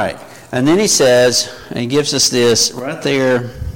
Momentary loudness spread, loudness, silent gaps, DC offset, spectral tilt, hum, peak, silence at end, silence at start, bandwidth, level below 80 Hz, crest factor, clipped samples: 12 LU; -13 LUFS; none; under 0.1%; -3 dB/octave; none; -2 dBFS; 0 s; 0 s; 17 kHz; -38 dBFS; 12 dB; under 0.1%